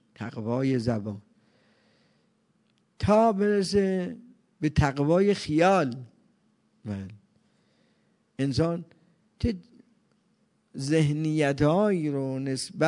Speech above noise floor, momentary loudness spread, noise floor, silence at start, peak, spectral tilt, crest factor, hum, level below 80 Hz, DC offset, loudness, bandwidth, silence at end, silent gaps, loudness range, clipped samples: 44 dB; 16 LU; -69 dBFS; 0.2 s; -8 dBFS; -6.5 dB/octave; 20 dB; none; -50 dBFS; under 0.1%; -26 LUFS; 11 kHz; 0 s; none; 9 LU; under 0.1%